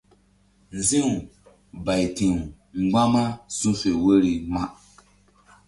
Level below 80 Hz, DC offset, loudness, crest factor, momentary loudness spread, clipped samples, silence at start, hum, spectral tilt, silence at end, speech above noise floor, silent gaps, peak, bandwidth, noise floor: -46 dBFS; under 0.1%; -23 LUFS; 18 dB; 12 LU; under 0.1%; 0.7 s; none; -5 dB/octave; 0.95 s; 38 dB; none; -6 dBFS; 11.5 kHz; -60 dBFS